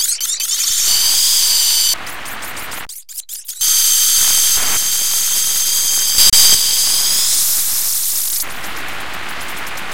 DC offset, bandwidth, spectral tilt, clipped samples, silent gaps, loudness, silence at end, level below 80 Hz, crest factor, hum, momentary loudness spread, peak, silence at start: 6%; 17.5 kHz; 2.5 dB/octave; under 0.1%; none; -11 LUFS; 0 s; -44 dBFS; 16 dB; none; 17 LU; 0 dBFS; 0 s